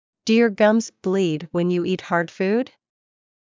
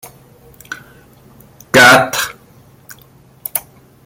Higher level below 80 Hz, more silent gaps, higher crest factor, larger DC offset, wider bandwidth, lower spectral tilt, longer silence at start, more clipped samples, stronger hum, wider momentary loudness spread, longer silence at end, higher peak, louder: second, -68 dBFS vs -52 dBFS; neither; about the same, 18 dB vs 16 dB; neither; second, 7.6 kHz vs 17 kHz; first, -6 dB/octave vs -2.5 dB/octave; first, 0.25 s vs 0.05 s; neither; neither; second, 7 LU vs 25 LU; first, 0.75 s vs 0.45 s; second, -4 dBFS vs 0 dBFS; second, -21 LUFS vs -11 LUFS